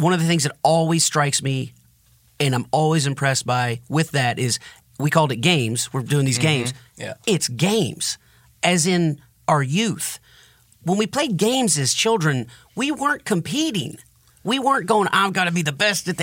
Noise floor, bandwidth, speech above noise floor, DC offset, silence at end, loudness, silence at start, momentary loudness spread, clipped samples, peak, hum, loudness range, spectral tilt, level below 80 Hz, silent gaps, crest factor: -57 dBFS; 17 kHz; 36 dB; under 0.1%; 0 s; -20 LUFS; 0 s; 10 LU; under 0.1%; -4 dBFS; none; 1 LU; -4 dB/octave; -62 dBFS; none; 18 dB